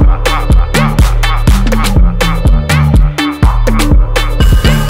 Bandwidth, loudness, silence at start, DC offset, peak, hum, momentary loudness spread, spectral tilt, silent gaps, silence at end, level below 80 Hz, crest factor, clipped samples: 16 kHz; -11 LUFS; 0 s; under 0.1%; 0 dBFS; none; 3 LU; -5.5 dB/octave; none; 0 s; -10 dBFS; 8 dB; under 0.1%